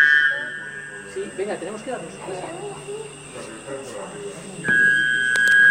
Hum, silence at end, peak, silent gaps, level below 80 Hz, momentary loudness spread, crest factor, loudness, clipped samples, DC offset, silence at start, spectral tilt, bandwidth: none; 0 s; -4 dBFS; none; -64 dBFS; 19 LU; 18 dB; -20 LUFS; under 0.1%; under 0.1%; 0 s; -2.5 dB/octave; 16 kHz